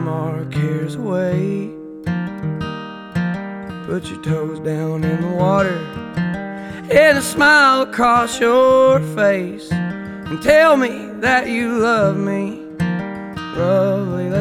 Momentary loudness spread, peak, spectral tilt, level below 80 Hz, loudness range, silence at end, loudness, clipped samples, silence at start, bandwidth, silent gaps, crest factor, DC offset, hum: 15 LU; 0 dBFS; -5.5 dB/octave; -46 dBFS; 10 LU; 0 s; -17 LUFS; under 0.1%; 0 s; 16 kHz; none; 16 dB; under 0.1%; none